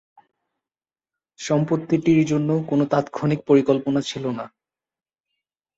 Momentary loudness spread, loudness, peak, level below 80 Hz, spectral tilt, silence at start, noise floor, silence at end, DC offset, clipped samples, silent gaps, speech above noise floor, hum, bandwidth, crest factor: 11 LU; -21 LUFS; -4 dBFS; -62 dBFS; -7 dB/octave; 1.4 s; under -90 dBFS; 1.3 s; under 0.1%; under 0.1%; none; over 70 dB; none; 8 kHz; 18 dB